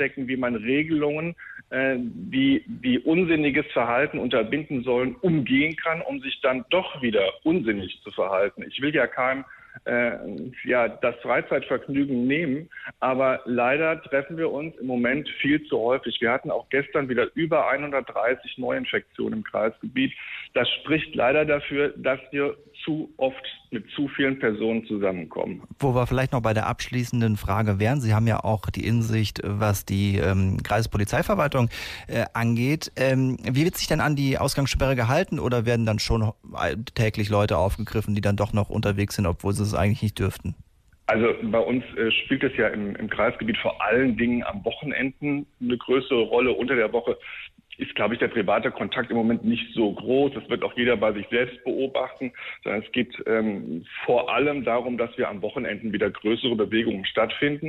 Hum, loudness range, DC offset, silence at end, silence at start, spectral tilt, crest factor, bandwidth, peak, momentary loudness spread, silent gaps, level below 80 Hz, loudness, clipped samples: none; 2 LU; under 0.1%; 0 s; 0 s; -6 dB/octave; 14 dB; 15.5 kHz; -10 dBFS; 7 LU; none; -46 dBFS; -24 LUFS; under 0.1%